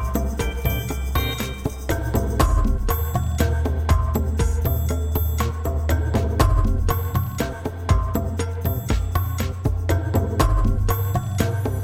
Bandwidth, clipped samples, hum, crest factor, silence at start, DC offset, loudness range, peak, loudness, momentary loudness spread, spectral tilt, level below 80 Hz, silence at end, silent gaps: 16.5 kHz; under 0.1%; none; 18 dB; 0 s; under 0.1%; 2 LU; -4 dBFS; -23 LUFS; 5 LU; -6 dB/octave; -24 dBFS; 0 s; none